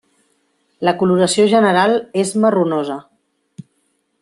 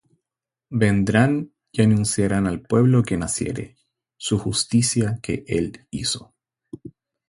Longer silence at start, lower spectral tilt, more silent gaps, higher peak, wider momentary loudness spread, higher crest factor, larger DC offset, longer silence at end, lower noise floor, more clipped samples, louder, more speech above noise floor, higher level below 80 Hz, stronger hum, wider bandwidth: about the same, 0.8 s vs 0.7 s; about the same, -5 dB/octave vs -5 dB/octave; neither; about the same, -2 dBFS vs -2 dBFS; second, 9 LU vs 12 LU; about the same, 16 dB vs 20 dB; neither; first, 1.2 s vs 0.4 s; second, -65 dBFS vs -88 dBFS; neither; first, -15 LUFS vs -21 LUFS; second, 51 dB vs 68 dB; second, -62 dBFS vs -46 dBFS; neither; about the same, 12.5 kHz vs 11.5 kHz